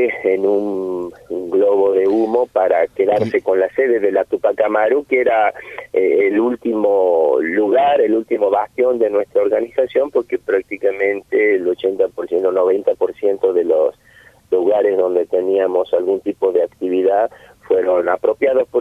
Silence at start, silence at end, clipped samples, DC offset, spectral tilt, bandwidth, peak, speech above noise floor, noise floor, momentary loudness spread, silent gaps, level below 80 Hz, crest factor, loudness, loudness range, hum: 0 s; 0 s; under 0.1%; under 0.1%; -7 dB/octave; 5.6 kHz; -2 dBFS; 32 dB; -48 dBFS; 5 LU; none; -58 dBFS; 14 dB; -16 LUFS; 2 LU; none